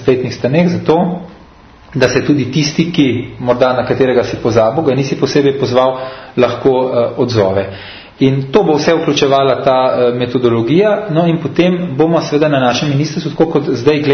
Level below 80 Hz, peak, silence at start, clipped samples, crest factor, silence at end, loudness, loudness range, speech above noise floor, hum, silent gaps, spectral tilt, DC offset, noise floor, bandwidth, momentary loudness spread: -44 dBFS; 0 dBFS; 0 s; under 0.1%; 12 dB; 0 s; -13 LUFS; 2 LU; 27 dB; none; none; -6.5 dB/octave; under 0.1%; -40 dBFS; 6.6 kHz; 4 LU